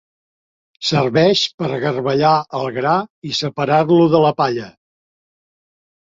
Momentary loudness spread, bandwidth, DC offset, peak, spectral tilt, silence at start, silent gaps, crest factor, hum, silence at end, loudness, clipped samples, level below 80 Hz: 9 LU; 7.8 kHz; under 0.1%; -2 dBFS; -5.5 dB/octave; 0.8 s; 1.54-1.58 s, 3.10-3.22 s; 16 dB; none; 1.35 s; -16 LUFS; under 0.1%; -58 dBFS